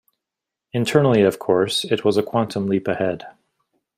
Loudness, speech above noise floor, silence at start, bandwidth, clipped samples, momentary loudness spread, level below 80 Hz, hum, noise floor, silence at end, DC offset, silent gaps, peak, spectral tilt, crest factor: -20 LUFS; 66 dB; 0.75 s; 15.5 kHz; under 0.1%; 8 LU; -60 dBFS; none; -85 dBFS; 0.65 s; under 0.1%; none; -2 dBFS; -5.5 dB/octave; 18 dB